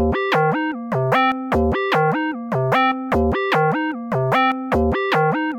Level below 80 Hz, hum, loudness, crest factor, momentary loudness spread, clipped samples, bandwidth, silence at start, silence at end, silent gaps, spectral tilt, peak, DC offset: -34 dBFS; none; -19 LUFS; 10 dB; 6 LU; under 0.1%; 16.5 kHz; 0 s; 0 s; none; -7 dB/octave; -8 dBFS; under 0.1%